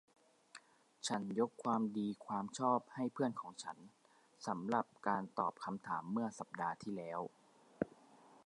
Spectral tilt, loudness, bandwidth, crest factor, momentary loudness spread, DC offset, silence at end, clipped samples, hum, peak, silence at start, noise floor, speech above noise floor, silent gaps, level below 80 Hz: -5 dB/octave; -41 LUFS; 11.5 kHz; 24 dB; 12 LU; under 0.1%; 0.1 s; under 0.1%; none; -18 dBFS; 0.55 s; -65 dBFS; 24 dB; none; -82 dBFS